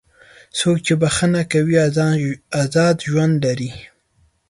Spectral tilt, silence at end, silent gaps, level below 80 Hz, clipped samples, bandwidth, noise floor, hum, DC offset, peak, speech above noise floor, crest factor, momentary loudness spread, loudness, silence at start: -5.5 dB/octave; 0.65 s; none; -50 dBFS; under 0.1%; 11.5 kHz; -60 dBFS; none; under 0.1%; -4 dBFS; 43 dB; 14 dB; 8 LU; -18 LUFS; 0.55 s